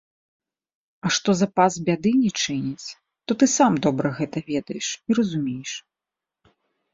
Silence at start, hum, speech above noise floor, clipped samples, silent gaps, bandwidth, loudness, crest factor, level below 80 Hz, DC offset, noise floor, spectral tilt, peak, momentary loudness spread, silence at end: 1.05 s; none; 66 dB; under 0.1%; none; 7.8 kHz; -22 LUFS; 20 dB; -62 dBFS; under 0.1%; -88 dBFS; -4.5 dB/octave; -4 dBFS; 13 LU; 1.15 s